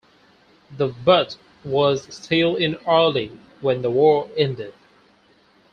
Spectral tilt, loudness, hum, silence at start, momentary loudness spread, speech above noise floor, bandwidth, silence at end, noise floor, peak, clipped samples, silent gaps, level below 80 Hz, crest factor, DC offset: -6 dB/octave; -20 LUFS; none; 0.7 s; 12 LU; 37 dB; 8.6 kHz; 1.05 s; -57 dBFS; -2 dBFS; under 0.1%; none; -58 dBFS; 20 dB; under 0.1%